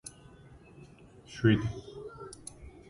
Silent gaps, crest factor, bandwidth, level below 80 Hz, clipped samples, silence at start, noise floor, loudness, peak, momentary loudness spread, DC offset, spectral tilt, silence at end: none; 24 dB; 11.5 kHz; -54 dBFS; under 0.1%; 0.05 s; -54 dBFS; -30 LUFS; -12 dBFS; 27 LU; under 0.1%; -6.5 dB/octave; 0.2 s